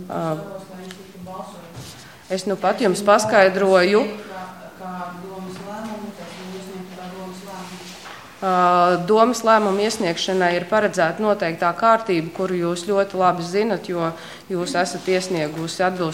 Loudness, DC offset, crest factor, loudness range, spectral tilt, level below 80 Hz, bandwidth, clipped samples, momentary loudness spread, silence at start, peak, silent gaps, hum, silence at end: -19 LUFS; 0.2%; 20 dB; 15 LU; -4.5 dB/octave; -62 dBFS; 17 kHz; under 0.1%; 20 LU; 0 s; 0 dBFS; none; none; 0 s